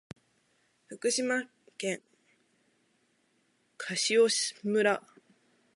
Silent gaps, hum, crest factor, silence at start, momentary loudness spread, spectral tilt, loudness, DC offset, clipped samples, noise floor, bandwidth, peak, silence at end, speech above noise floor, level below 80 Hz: none; none; 20 dB; 0.9 s; 16 LU; -2.5 dB/octave; -29 LUFS; under 0.1%; under 0.1%; -72 dBFS; 11.5 kHz; -14 dBFS; 0.75 s; 43 dB; -80 dBFS